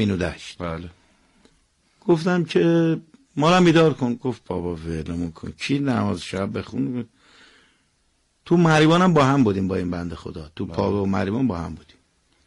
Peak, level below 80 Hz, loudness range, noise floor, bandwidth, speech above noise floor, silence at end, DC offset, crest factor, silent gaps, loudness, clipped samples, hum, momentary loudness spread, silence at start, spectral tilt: -8 dBFS; -48 dBFS; 7 LU; -66 dBFS; 11.5 kHz; 45 dB; 0.65 s; under 0.1%; 14 dB; none; -21 LUFS; under 0.1%; none; 17 LU; 0 s; -6.5 dB/octave